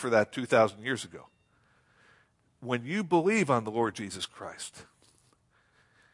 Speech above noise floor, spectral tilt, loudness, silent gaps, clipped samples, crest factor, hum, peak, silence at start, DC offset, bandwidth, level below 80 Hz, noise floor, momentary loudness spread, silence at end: 39 dB; -5 dB/octave; -29 LUFS; none; under 0.1%; 22 dB; none; -10 dBFS; 0 s; under 0.1%; 11.5 kHz; -74 dBFS; -68 dBFS; 17 LU; 1.3 s